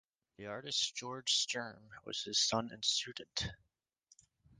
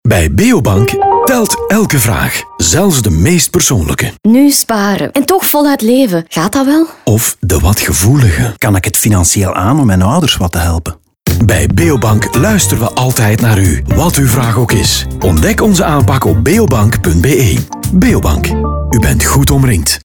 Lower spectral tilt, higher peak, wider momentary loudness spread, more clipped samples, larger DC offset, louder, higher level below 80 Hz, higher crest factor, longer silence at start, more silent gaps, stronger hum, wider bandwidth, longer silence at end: second, -1.5 dB/octave vs -5 dB/octave; second, -20 dBFS vs 0 dBFS; first, 14 LU vs 4 LU; neither; second, under 0.1% vs 0.7%; second, -35 LUFS vs -10 LUFS; second, -66 dBFS vs -24 dBFS; first, 20 dB vs 10 dB; first, 0.4 s vs 0.05 s; neither; neither; second, 10.5 kHz vs over 20 kHz; first, 1.05 s vs 0.05 s